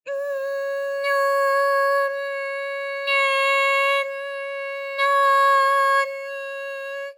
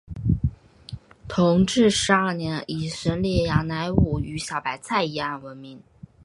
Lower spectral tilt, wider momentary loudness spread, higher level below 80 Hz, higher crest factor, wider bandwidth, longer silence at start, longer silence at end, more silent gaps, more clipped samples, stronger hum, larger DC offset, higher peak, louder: second, 4 dB/octave vs -5.5 dB/octave; second, 13 LU vs 22 LU; second, under -90 dBFS vs -38 dBFS; second, 12 dB vs 22 dB; first, 17 kHz vs 11.5 kHz; about the same, 0.05 s vs 0.1 s; second, 0.05 s vs 0.45 s; neither; neither; neither; neither; second, -10 dBFS vs -2 dBFS; about the same, -21 LUFS vs -23 LUFS